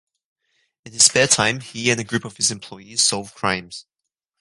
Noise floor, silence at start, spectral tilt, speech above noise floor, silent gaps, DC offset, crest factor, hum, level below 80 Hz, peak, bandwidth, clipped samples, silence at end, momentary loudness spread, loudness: -66 dBFS; 0.85 s; -1.5 dB/octave; 45 dB; none; under 0.1%; 22 dB; none; -58 dBFS; 0 dBFS; 11.5 kHz; under 0.1%; 0.6 s; 19 LU; -18 LUFS